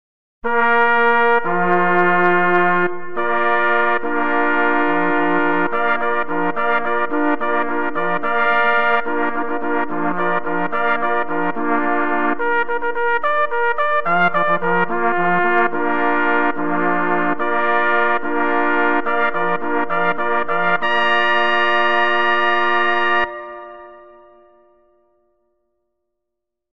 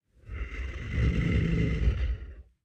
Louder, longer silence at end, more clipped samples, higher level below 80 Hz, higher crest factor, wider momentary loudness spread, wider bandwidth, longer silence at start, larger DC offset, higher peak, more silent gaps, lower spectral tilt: first, -17 LUFS vs -30 LUFS; second, 0 s vs 0.25 s; neither; second, -60 dBFS vs -32 dBFS; about the same, 16 dB vs 16 dB; second, 6 LU vs 14 LU; second, 7 kHz vs 7.8 kHz; first, 0.4 s vs 0.25 s; first, 7% vs under 0.1%; first, 0 dBFS vs -14 dBFS; neither; about the same, -7 dB/octave vs -8 dB/octave